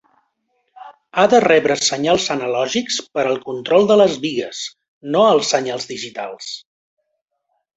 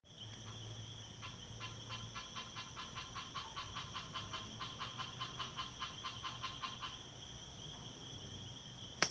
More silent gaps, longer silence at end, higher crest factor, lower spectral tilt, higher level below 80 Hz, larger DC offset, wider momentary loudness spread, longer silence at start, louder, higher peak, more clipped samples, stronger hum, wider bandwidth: first, 4.88-5.01 s vs none; first, 1.15 s vs 0 s; second, 18 dB vs 38 dB; about the same, -3.5 dB/octave vs -2.5 dB/octave; first, -60 dBFS vs -66 dBFS; neither; first, 15 LU vs 6 LU; first, 0.8 s vs 0.05 s; first, -17 LUFS vs -46 LUFS; first, -2 dBFS vs -10 dBFS; neither; neither; second, 8.2 kHz vs 10 kHz